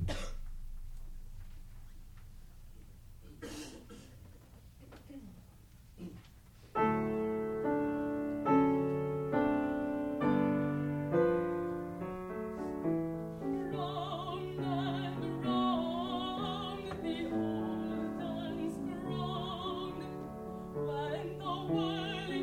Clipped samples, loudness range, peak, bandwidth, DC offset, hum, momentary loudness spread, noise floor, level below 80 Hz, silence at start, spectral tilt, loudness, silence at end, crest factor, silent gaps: under 0.1%; 20 LU; -18 dBFS; 16.5 kHz; under 0.1%; none; 21 LU; -57 dBFS; -52 dBFS; 0 s; -7 dB/octave; -35 LUFS; 0 s; 20 dB; none